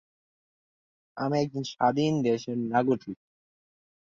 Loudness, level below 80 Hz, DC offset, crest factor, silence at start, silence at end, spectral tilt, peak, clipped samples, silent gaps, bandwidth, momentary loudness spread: -28 LUFS; -68 dBFS; under 0.1%; 20 dB; 1.15 s; 1 s; -6.5 dB/octave; -10 dBFS; under 0.1%; none; 7.6 kHz; 15 LU